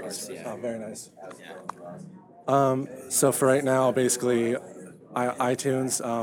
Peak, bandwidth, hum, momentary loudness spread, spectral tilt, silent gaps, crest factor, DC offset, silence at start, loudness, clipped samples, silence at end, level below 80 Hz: -8 dBFS; 19 kHz; none; 21 LU; -4.5 dB/octave; none; 18 dB; under 0.1%; 0 s; -25 LUFS; under 0.1%; 0 s; -72 dBFS